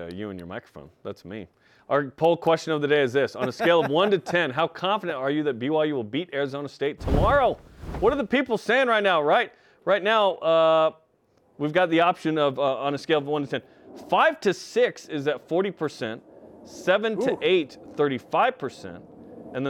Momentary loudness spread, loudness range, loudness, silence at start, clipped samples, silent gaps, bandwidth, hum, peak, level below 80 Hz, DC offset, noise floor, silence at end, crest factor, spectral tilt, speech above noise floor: 16 LU; 4 LU; -24 LUFS; 0 s; under 0.1%; none; 14 kHz; none; -8 dBFS; -44 dBFS; under 0.1%; -64 dBFS; 0 s; 16 dB; -5.5 dB/octave; 40 dB